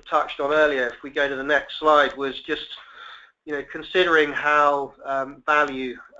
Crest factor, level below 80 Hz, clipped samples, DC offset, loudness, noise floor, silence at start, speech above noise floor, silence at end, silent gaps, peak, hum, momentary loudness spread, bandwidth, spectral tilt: 18 dB; -56 dBFS; under 0.1%; under 0.1%; -22 LUFS; -44 dBFS; 0.05 s; 22 dB; 0.15 s; none; -4 dBFS; none; 14 LU; 7.8 kHz; -4 dB/octave